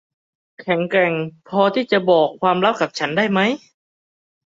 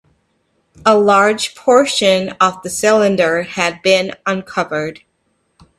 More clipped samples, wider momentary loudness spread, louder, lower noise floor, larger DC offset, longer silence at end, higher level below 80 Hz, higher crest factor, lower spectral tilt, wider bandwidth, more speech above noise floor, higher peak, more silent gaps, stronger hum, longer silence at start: neither; about the same, 8 LU vs 9 LU; second, -18 LUFS vs -14 LUFS; first, under -90 dBFS vs -64 dBFS; neither; about the same, 0.95 s vs 0.85 s; second, -64 dBFS vs -58 dBFS; about the same, 18 dB vs 16 dB; first, -6 dB/octave vs -3.5 dB/octave; second, 7.8 kHz vs 14 kHz; first, over 72 dB vs 50 dB; about the same, -2 dBFS vs 0 dBFS; neither; neither; second, 0.6 s vs 0.85 s